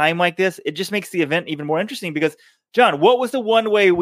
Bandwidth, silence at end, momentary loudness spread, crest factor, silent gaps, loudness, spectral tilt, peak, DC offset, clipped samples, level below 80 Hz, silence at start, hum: 15.5 kHz; 0 s; 9 LU; 18 dB; none; -19 LUFS; -5 dB/octave; -2 dBFS; under 0.1%; under 0.1%; -68 dBFS; 0 s; none